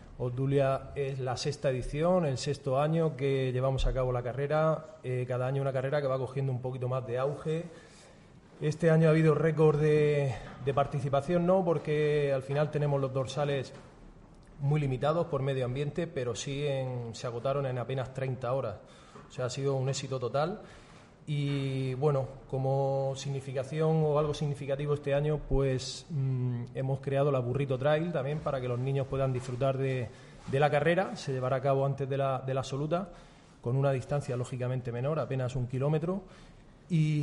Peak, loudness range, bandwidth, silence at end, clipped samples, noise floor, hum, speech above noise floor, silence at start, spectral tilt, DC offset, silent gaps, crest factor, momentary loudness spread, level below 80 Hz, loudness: -14 dBFS; 6 LU; 11 kHz; 0 s; under 0.1%; -55 dBFS; none; 25 dB; 0 s; -7 dB/octave; under 0.1%; none; 16 dB; 9 LU; -48 dBFS; -31 LUFS